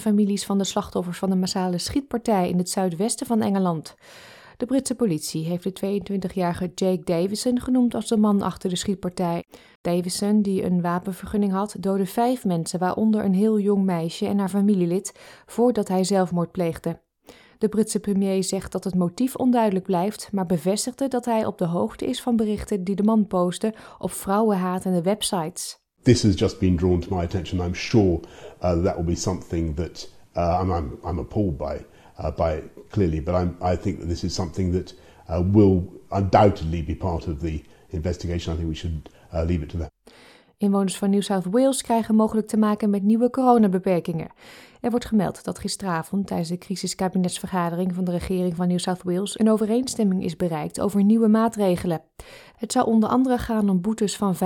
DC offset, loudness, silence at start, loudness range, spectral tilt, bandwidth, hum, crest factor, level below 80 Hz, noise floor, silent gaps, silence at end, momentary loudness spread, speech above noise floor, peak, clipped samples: under 0.1%; -23 LUFS; 0 s; 5 LU; -6 dB/octave; 17.5 kHz; none; 20 dB; -46 dBFS; -51 dBFS; 9.75-9.84 s; 0 s; 9 LU; 28 dB; -2 dBFS; under 0.1%